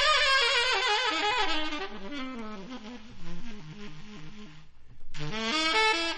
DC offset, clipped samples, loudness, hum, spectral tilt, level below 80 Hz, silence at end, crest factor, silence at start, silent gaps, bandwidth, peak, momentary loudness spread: under 0.1%; under 0.1%; -26 LUFS; none; -2 dB/octave; -44 dBFS; 0 s; 18 dB; 0 s; none; 10 kHz; -10 dBFS; 23 LU